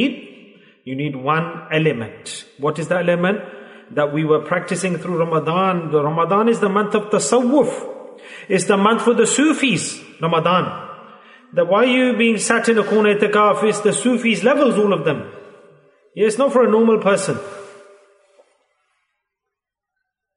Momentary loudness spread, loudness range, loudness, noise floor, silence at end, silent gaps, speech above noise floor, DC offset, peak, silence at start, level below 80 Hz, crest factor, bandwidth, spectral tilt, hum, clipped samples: 14 LU; 5 LU; -17 LUFS; -82 dBFS; 2.65 s; none; 65 dB; under 0.1%; -2 dBFS; 0 s; -68 dBFS; 16 dB; 11 kHz; -4.5 dB/octave; none; under 0.1%